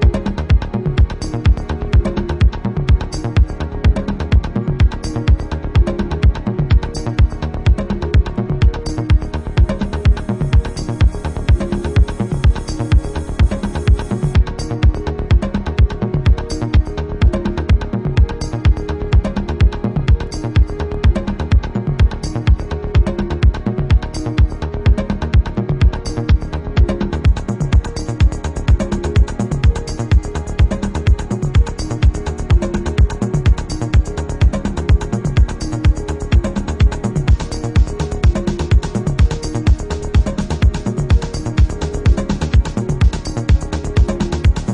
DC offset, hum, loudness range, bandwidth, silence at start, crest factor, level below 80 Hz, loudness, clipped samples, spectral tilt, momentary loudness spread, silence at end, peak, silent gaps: under 0.1%; none; 1 LU; 10.5 kHz; 0 s; 12 dB; -18 dBFS; -17 LUFS; under 0.1%; -7 dB/octave; 4 LU; 0 s; -2 dBFS; none